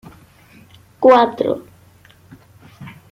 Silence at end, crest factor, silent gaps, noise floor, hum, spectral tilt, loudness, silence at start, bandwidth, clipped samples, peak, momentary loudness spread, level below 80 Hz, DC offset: 0.2 s; 18 dB; none; -48 dBFS; none; -6.5 dB/octave; -15 LUFS; 1 s; 7.4 kHz; under 0.1%; -2 dBFS; 27 LU; -60 dBFS; under 0.1%